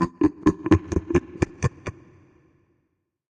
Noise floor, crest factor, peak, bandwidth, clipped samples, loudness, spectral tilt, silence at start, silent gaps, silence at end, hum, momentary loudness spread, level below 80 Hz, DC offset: -74 dBFS; 20 dB; -6 dBFS; 9.2 kHz; under 0.1%; -24 LUFS; -7.5 dB/octave; 0 s; none; 1.4 s; none; 10 LU; -42 dBFS; under 0.1%